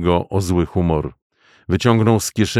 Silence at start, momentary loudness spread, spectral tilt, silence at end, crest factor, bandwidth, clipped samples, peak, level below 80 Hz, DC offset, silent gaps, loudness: 0 s; 8 LU; -6 dB/octave; 0 s; 16 dB; 15.5 kHz; under 0.1%; -2 dBFS; -36 dBFS; under 0.1%; 1.22-1.30 s; -18 LUFS